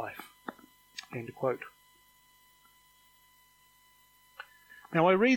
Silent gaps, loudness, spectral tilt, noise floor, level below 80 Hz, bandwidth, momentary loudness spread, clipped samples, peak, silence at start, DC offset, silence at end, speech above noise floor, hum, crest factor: none; -33 LUFS; -6 dB/octave; -64 dBFS; -76 dBFS; 17 kHz; 24 LU; under 0.1%; -10 dBFS; 0 s; under 0.1%; 0 s; 37 dB; 50 Hz at -75 dBFS; 24 dB